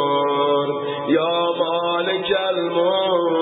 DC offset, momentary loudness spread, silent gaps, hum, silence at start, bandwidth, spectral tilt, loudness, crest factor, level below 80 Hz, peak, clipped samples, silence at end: under 0.1%; 3 LU; none; none; 0 s; 4 kHz; -10 dB/octave; -20 LUFS; 12 dB; -66 dBFS; -6 dBFS; under 0.1%; 0 s